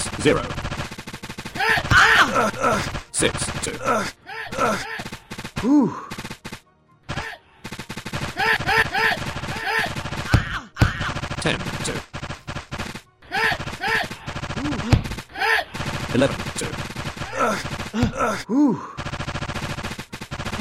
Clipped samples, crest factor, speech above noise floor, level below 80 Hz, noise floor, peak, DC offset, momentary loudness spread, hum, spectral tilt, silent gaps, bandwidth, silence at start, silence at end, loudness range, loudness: under 0.1%; 18 dB; 35 dB; -38 dBFS; -56 dBFS; -6 dBFS; 0.4%; 15 LU; none; -4 dB/octave; none; 16 kHz; 0 s; 0 s; 6 LU; -22 LUFS